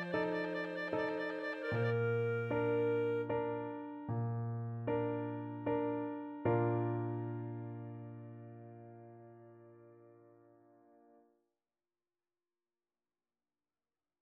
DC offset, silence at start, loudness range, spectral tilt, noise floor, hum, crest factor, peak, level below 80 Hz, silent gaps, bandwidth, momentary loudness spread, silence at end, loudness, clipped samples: under 0.1%; 0 s; 17 LU; -9 dB/octave; under -90 dBFS; none; 18 dB; -22 dBFS; -74 dBFS; none; 5.6 kHz; 19 LU; 4 s; -38 LUFS; under 0.1%